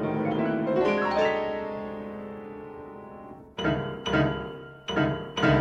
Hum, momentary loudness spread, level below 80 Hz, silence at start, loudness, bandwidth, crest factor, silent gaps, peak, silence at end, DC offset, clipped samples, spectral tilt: none; 17 LU; -50 dBFS; 0 s; -27 LUFS; 7.8 kHz; 18 dB; none; -10 dBFS; 0 s; under 0.1%; under 0.1%; -6.5 dB/octave